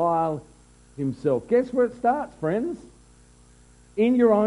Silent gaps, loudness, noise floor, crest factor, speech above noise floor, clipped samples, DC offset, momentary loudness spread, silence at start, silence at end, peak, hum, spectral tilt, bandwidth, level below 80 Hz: none; -24 LUFS; -53 dBFS; 16 dB; 30 dB; under 0.1%; under 0.1%; 12 LU; 0 s; 0 s; -8 dBFS; 60 Hz at -45 dBFS; -8 dB/octave; 11 kHz; -56 dBFS